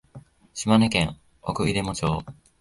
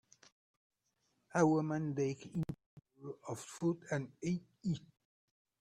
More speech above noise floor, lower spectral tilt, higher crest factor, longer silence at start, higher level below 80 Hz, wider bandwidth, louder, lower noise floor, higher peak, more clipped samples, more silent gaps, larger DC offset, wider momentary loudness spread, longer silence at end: second, 25 dB vs 45 dB; second, -5 dB/octave vs -7 dB/octave; about the same, 20 dB vs 22 dB; second, 0.15 s vs 1.35 s; first, -44 dBFS vs -72 dBFS; second, 11.5 kHz vs 13 kHz; first, -24 LUFS vs -38 LUFS; second, -48 dBFS vs -81 dBFS; first, -6 dBFS vs -18 dBFS; neither; second, none vs 2.66-2.77 s; neither; about the same, 16 LU vs 16 LU; second, 0.25 s vs 0.8 s